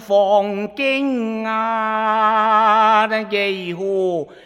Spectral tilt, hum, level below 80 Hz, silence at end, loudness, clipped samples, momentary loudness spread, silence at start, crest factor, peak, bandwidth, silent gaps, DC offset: -5.5 dB/octave; none; -64 dBFS; 0.1 s; -17 LUFS; under 0.1%; 8 LU; 0 s; 14 dB; -4 dBFS; 14 kHz; none; under 0.1%